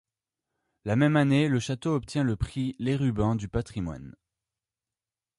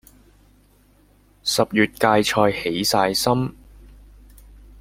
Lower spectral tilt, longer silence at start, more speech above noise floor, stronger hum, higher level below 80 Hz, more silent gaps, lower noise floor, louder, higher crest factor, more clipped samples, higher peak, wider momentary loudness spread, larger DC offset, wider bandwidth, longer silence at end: first, -7 dB/octave vs -4 dB/octave; second, 0.85 s vs 1.45 s; first, over 64 dB vs 36 dB; second, none vs 50 Hz at -45 dBFS; about the same, -46 dBFS vs -48 dBFS; neither; first, under -90 dBFS vs -56 dBFS; second, -27 LUFS vs -20 LUFS; about the same, 18 dB vs 20 dB; neither; second, -10 dBFS vs -2 dBFS; first, 12 LU vs 6 LU; neither; second, 11.5 kHz vs 16.5 kHz; first, 1.3 s vs 0.95 s